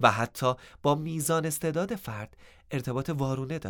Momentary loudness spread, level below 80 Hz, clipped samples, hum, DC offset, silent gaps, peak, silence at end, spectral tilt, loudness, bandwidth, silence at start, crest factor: 9 LU; -58 dBFS; under 0.1%; none; under 0.1%; none; -6 dBFS; 0 s; -5 dB/octave; -30 LUFS; over 20 kHz; 0 s; 24 dB